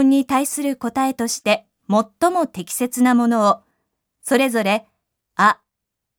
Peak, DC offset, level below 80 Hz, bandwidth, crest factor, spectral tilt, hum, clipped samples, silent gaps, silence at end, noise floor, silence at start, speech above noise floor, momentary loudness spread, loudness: -2 dBFS; under 0.1%; -64 dBFS; over 20 kHz; 18 dB; -4 dB/octave; none; under 0.1%; none; 0.65 s; -81 dBFS; 0 s; 63 dB; 8 LU; -19 LUFS